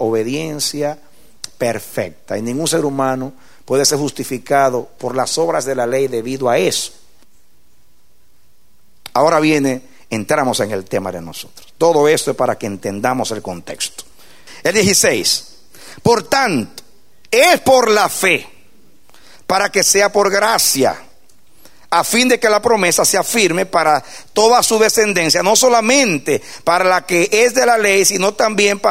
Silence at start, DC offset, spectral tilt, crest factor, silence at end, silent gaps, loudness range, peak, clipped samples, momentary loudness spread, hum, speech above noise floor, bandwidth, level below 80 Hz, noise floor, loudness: 0 s; 1%; -2.5 dB/octave; 16 dB; 0 s; none; 7 LU; 0 dBFS; under 0.1%; 13 LU; none; 43 dB; 16.5 kHz; -54 dBFS; -58 dBFS; -14 LUFS